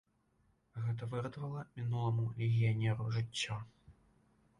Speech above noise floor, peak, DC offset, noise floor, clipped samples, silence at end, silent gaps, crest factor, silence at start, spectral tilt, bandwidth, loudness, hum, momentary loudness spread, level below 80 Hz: 39 dB; -24 dBFS; under 0.1%; -75 dBFS; under 0.1%; 0.7 s; none; 14 dB; 0.75 s; -6 dB/octave; 11 kHz; -37 LUFS; none; 11 LU; -66 dBFS